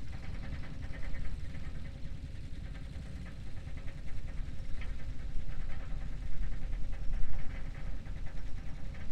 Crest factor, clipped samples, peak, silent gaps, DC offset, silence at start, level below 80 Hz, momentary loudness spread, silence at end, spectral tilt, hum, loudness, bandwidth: 16 dB; under 0.1%; -14 dBFS; none; under 0.1%; 0 s; -40 dBFS; 3 LU; 0 s; -6.5 dB/octave; none; -45 LUFS; 5.8 kHz